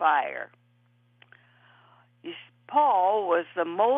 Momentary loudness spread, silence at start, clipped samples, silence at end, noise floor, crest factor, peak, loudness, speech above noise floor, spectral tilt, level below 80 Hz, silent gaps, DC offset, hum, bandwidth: 21 LU; 0 s; under 0.1%; 0 s; -64 dBFS; 18 dB; -8 dBFS; -25 LUFS; 40 dB; -6.5 dB/octave; under -90 dBFS; none; under 0.1%; none; 3.8 kHz